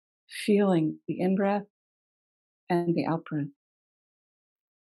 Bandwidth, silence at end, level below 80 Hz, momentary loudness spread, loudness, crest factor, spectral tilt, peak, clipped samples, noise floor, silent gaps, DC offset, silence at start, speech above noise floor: 12 kHz; 1.35 s; -80 dBFS; 11 LU; -28 LUFS; 16 dB; -7.5 dB/octave; -12 dBFS; under 0.1%; under -90 dBFS; 1.70-2.67 s; under 0.1%; 0.3 s; over 64 dB